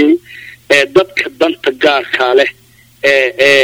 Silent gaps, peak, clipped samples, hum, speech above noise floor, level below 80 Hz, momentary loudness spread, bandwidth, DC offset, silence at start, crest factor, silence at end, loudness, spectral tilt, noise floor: none; 0 dBFS; 0.2%; none; 24 dB; -52 dBFS; 8 LU; 16.5 kHz; under 0.1%; 0 s; 12 dB; 0 s; -11 LUFS; -3 dB/octave; -34 dBFS